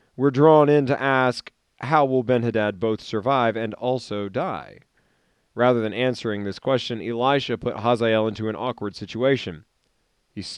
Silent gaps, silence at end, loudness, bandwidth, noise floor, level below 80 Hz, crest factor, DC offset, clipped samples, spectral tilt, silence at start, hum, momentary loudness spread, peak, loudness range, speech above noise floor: none; 0 s; -22 LUFS; 10.5 kHz; -69 dBFS; -62 dBFS; 18 dB; under 0.1%; under 0.1%; -6.5 dB/octave; 0.2 s; none; 11 LU; -4 dBFS; 5 LU; 47 dB